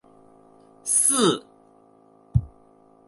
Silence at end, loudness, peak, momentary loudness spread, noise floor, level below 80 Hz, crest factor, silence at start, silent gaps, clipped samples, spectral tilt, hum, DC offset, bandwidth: 0.6 s; -21 LUFS; -6 dBFS; 13 LU; -55 dBFS; -42 dBFS; 20 dB; 0.85 s; none; under 0.1%; -3.5 dB/octave; none; under 0.1%; 12 kHz